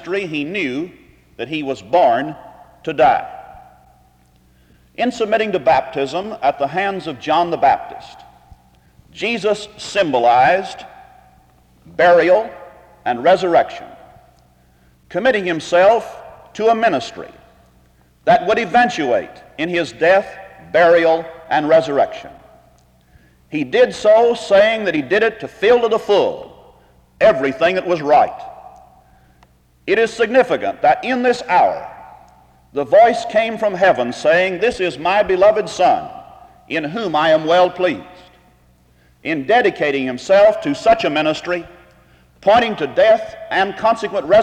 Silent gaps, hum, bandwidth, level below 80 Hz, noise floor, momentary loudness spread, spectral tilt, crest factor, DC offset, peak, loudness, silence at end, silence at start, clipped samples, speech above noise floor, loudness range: none; none; 9.8 kHz; -52 dBFS; -53 dBFS; 14 LU; -5 dB/octave; 14 dB; under 0.1%; -2 dBFS; -16 LUFS; 0 s; 0 s; under 0.1%; 38 dB; 4 LU